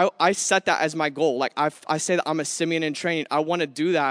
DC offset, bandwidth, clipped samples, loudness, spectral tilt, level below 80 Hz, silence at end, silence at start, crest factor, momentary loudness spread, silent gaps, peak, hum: under 0.1%; 11 kHz; under 0.1%; -23 LUFS; -3.5 dB/octave; -78 dBFS; 0 s; 0 s; 18 dB; 5 LU; none; -6 dBFS; none